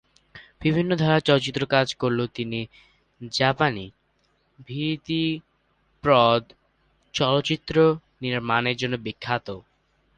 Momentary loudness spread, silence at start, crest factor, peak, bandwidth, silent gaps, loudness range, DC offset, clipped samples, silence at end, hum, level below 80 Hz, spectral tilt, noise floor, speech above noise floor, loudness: 13 LU; 0.35 s; 22 dB; -4 dBFS; 9.6 kHz; none; 5 LU; under 0.1%; under 0.1%; 0.55 s; none; -56 dBFS; -6 dB/octave; -68 dBFS; 45 dB; -23 LUFS